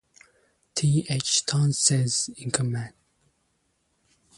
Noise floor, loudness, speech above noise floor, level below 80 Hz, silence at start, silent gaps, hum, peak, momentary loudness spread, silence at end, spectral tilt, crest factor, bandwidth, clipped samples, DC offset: -72 dBFS; -24 LUFS; 47 dB; -62 dBFS; 0.75 s; none; none; -6 dBFS; 11 LU; 1.5 s; -3.5 dB/octave; 22 dB; 11.5 kHz; under 0.1%; under 0.1%